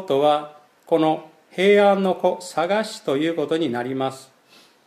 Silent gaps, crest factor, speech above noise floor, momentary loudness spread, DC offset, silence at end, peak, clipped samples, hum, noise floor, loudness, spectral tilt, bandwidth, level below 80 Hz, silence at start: none; 16 dB; 33 dB; 11 LU; under 0.1%; 0.65 s; -6 dBFS; under 0.1%; none; -53 dBFS; -21 LUFS; -5.5 dB/octave; 14 kHz; -76 dBFS; 0 s